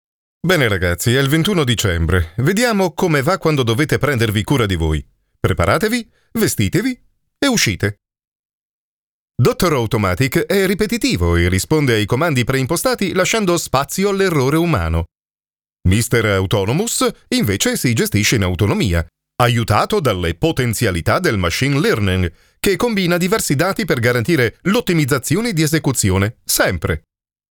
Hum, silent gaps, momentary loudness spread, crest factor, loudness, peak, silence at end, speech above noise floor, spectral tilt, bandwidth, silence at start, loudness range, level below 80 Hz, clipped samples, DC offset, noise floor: none; 8.27-9.28 s; 5 LU; 16 dB; -16 LUFS; 0 dBFS; 0.55 s; over 74 dB; -5 dB/octave; over 20 kHz; 0.45 s; 3 LU; -38 dBFS; under 0.1%; under 0.1%; under -90 dBFS